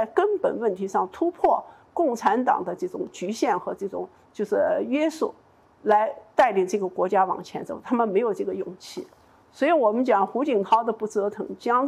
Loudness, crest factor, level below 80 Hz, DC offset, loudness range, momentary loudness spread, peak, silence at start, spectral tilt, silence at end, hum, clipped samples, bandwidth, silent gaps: -24 LUFS; 16 dB; -66 dBFS; under 0.1%; 2 LU; 11 LU; -8 dBFS; 0 s; -5.5 dB/octave; 0 s; none; under 0.1%; 13.5 kHz; none